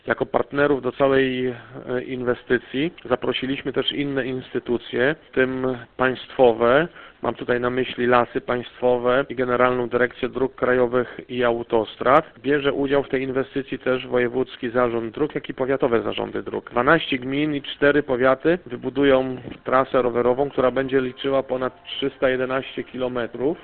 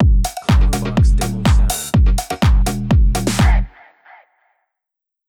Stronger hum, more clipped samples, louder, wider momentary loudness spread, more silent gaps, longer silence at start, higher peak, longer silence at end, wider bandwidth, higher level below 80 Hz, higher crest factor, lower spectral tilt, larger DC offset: neither; neither; second, -22 LUFS vs -16 LUFS; first, 9 LU vs 2 LU; neither; about the same, 0.05 s vs 0 s; about the same, 0 dBFS vs -2 dBFS; second, 0 s vs 1.6 s; second, 4.4 kHz vs 18.5 kHz; second, -50 dBFS vs -16 dBFS; first, 22 dB vs 12 dB; first, -9 dB/octave vs -5.5 dB/octave; neither